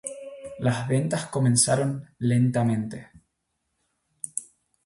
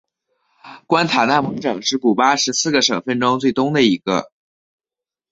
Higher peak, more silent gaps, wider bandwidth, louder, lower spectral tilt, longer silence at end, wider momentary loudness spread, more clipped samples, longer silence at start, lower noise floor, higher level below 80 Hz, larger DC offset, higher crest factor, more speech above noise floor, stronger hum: second, -6 dBFS vs -2 dBFS; neither; first, 12 kHz vs 8 kHz; second, -25 LUFS vs -17 LUFS; first, -5 dB/octave vs -3.5 dB/octave; second, 0.4 s vs 1.05 s; first, 17 LU vs 5 LU; neither; second, 0.05 s vs 0.65 s; second, -78 dBFS vs -89 dBFS; about the same, -60 dBFS vs -60 dBFS; neither; about the same, 20 dB vs 18 dB; second, 54 dB vs 72 dB; neither